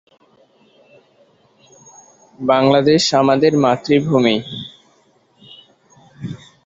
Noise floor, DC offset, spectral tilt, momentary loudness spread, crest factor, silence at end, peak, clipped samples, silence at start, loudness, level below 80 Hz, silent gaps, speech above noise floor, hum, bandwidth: -56 dBFS; under 0.1%; -5.5 dB/octave; 19 LU; 18 dB; 0.3 s; -2 dBFS; under 0.1%; 2.4 s; -15 LUFS; -58 dBFS; none; 42 dB; none; 8.2 kHz